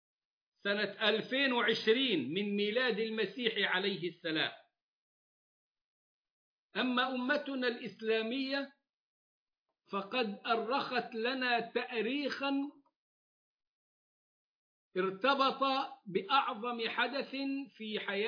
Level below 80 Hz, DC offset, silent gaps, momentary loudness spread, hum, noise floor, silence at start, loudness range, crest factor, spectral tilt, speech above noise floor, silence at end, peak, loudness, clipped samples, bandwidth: under -90 dBFS; under 0.1%; 4.82-5.75 s, 5.81-6.69 s, 8.90-9.47 s, 9.59-9.66 s, 12.96-13.59 s, 13.67-14.91 s; 9 LU; none; -85 dBFS; 0.65 s; 6 LU; 20 dB; -5.5 dB/octave; 51 dB; 0 s; -16 dBFS; -34 LUFS; under 0.1%; 5.2 kHz